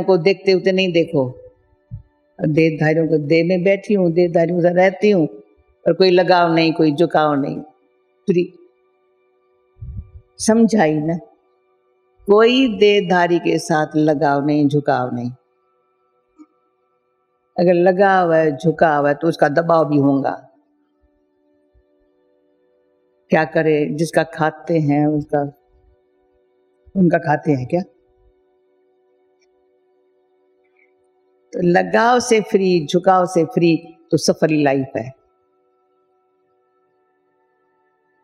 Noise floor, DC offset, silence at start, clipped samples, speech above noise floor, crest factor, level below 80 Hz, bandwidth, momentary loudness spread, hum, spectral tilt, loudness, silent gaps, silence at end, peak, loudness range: -66 dBFS; under 0.1%; 0 s; under 0.1%; 50 dB; 18 dB; -52 dBFS; 13 kHz; 11 LU; none; -6 dB/octave; -16 LUFS; none; 3.1 s; 0 dBFS; 8 LU